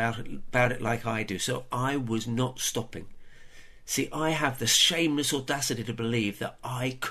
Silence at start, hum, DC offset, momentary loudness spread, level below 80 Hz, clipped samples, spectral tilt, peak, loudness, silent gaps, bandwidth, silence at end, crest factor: 0 s; none; under 0.1%; 12 LU; -50 dBFS; under 0.1%; -3 dB/octave; -8 dBFS; -28 LUFS; none; 13.5 kHz; 0 s; 20 dB